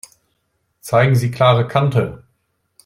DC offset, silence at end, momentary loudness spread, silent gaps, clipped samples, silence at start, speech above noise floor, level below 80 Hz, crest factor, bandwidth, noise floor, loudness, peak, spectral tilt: under 0.1%; 0.7 s; 9 LU; none; under 0.1%; 0.85 s; 53 dB; -52 dBFS; 16 dB; 13.5 kHz; -68 dBFS; -16 LUFS; -2 dBFS; -6.5 dB/octave